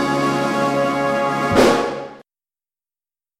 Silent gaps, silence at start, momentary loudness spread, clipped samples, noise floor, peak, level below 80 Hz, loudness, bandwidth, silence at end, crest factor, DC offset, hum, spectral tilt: none; 0 s; 11 LU; under 0.1%; under -90 dBFS; -4 dBFS; -48 dBFS; -18 LUFS; 16 kHz; 1.2 s; 16 dB; under 0.1%; none; -5 dB/octave